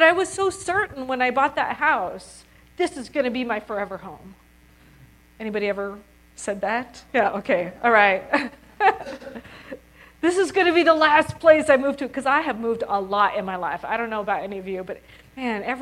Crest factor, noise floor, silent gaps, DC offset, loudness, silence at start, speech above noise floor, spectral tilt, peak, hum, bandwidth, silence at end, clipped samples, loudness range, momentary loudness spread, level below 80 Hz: 22 dB; -53 dBFS; none; under 0.1%; -22 LUFS; 0 s; 30 dB; -4 dB/octave; 0 dBFS; none; 14 kHz; 0 s; under 0.1%; 10 LU; 18 LU; -56 dBFS